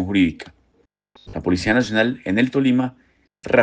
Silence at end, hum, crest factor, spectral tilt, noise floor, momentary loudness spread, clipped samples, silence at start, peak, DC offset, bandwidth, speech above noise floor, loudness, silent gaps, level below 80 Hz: 0 s; none; 18 dB; -6 dB/octave; -63 dBFS; 19 LU; under 0.1%; 0 s; -2 dBFS; under 0.1%; 9 kHz; 44 dB; -20 LUFS; none; -50 dBFS